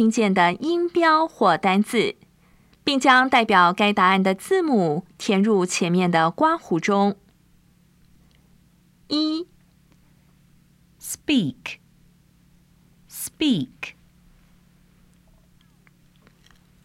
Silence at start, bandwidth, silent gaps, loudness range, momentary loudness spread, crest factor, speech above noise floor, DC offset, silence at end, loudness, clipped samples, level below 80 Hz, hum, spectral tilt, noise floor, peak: 0 s; 16 kHz; none; 13 LU; 18 LU; 20 dB; 38 dB; under 0.1%; 2.95 s; -20 LUFS; under 0.1%; -62 dBFS; none; -4.5 dB/octave; -57 dBFS; -2 dBFS